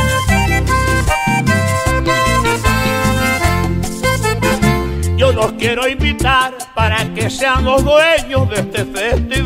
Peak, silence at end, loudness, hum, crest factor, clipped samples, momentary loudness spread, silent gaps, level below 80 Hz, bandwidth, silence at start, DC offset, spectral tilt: 0 dBFS; 0 s; -14 LUFS; none; 14 dB; under 0.1%; 5 LU; none; -24 dBFS; 16.5 kHz; 0 s; under 0.1%; -4.5 dB/octave